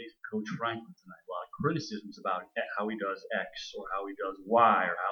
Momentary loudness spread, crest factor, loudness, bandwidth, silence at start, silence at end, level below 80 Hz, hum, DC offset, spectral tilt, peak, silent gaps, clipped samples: 16 LU; 20 dB; -32 LUFS; 19 kHz; 0 s; 0 s; -72 dBFS; none; under 0.1%; -5.5 dB/octave; -12 dBFS; none; under 0.1%